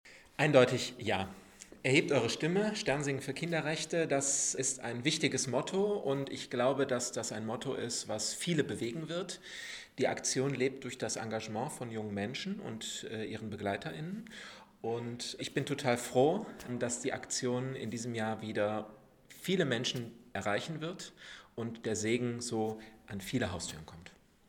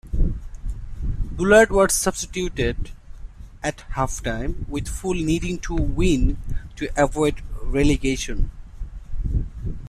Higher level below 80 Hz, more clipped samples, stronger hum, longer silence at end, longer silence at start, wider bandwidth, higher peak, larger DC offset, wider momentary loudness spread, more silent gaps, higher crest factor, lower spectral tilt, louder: second, -68 dBFS vs -28 dBFS; neither; neither; first, 0.4 s vs 0 s; about the same, 0.05 s vs 0.05 s; first, 18.5 kHz vs 14 kHz; second, -10 dBFS vs -2 dBFS; neither; second, 13 LU vs 18 LU; neither; about the same, 24 dB vs 20 dB; about the same, -4 dB/octave vs -5 dB/octave; second, -34 LUFS vs -23 LUFS